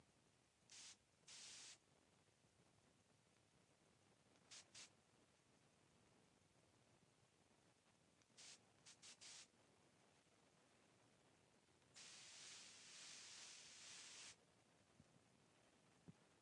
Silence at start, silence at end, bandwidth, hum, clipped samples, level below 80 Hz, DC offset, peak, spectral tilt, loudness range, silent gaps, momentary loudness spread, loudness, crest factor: 0 s; 0 s; 11 kHz; none; under 0.1%; under -90 dBFS; under 0.1%; -48 dBFS; -0.5 dB/octave; 9 LU; none; 8 LU; -61 LUFS; 20 dB